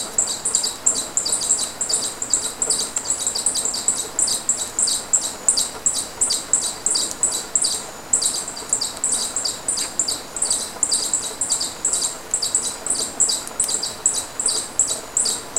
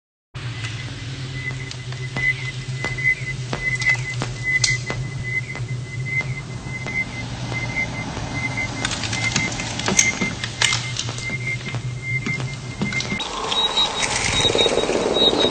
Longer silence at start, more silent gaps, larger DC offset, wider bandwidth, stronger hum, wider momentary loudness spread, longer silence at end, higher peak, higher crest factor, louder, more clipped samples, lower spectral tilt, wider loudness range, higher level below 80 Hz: second, 0 s vs 0.35 s; neither; neither; first, 17 kHz vs 14 kHz; neither; second, 4 LU vs 12 LU; about the same, 0 s vs 0 s; about the same, 0 dBFS vs 0 dBFS; about the same, 22 dB vs 24 dB; first, -19 LUFS vs -22 LUFS; neither; second, 0.5 dB/octave vs -3 dB/octave; second, 2 LU vs 5 LU; second, -52 dBFS vs -42 dBFS